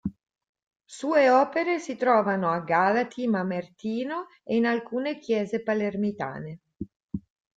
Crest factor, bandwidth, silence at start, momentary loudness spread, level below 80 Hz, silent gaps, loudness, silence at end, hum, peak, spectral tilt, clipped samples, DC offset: 18 dB; 9.2 kHz; 0.05 s; 17 LU; -62 dBFS; 0.49-0.55 s, 0.67-0.71 s, 6.96-7.09 s; -26 LUFS; 0.4 s; none; -8 dBFS; -6.5 dB/octave; under 0.1%; under 0.1%